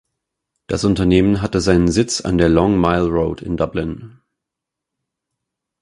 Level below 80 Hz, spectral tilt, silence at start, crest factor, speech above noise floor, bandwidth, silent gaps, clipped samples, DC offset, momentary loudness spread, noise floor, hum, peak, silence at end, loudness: -34 dBFS; -6 dB/octave; 0.7 s; 18 dB; 67 dB; 11.5 kHz; none; under 0.1%; under 0.1%; 9 LU; -83 dBFS; none; 0 dBFS; 1.75 s; -17 LUFS